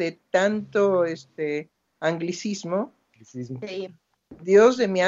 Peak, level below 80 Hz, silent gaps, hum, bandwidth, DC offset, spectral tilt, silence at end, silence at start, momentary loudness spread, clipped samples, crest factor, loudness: -6 dBFS; -72 dBFS; none; none; 7.8 kHz; under 0.1%; -5.5 dB/octave; 0 s; 0 s; 19 LU; under 0.1%; 18 dB; -23 LUFS